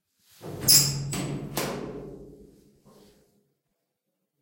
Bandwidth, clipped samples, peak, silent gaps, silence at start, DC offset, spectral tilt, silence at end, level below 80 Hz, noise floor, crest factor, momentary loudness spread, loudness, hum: 16.5 kHz; under 0.1%; -4 dBFS; none; 0.4 s; under 0.1%; -2 dB/octave; 2 s; -56 dBFS; -81 dBFS; 26 dB; 25 LU; -23 LUFS; none